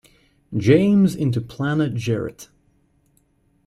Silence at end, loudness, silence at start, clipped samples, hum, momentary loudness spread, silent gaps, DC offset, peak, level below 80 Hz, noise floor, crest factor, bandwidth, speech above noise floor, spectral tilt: 1.2 s; -20 LUFS; 0.5 s; under 0.1%; none; 11 LU; none; under 0.1%; -4 dBFS; -54 dBFS; -62 dBFS; 18 dB; 13.5 kHz; 43 dB; -7.5 dB/octave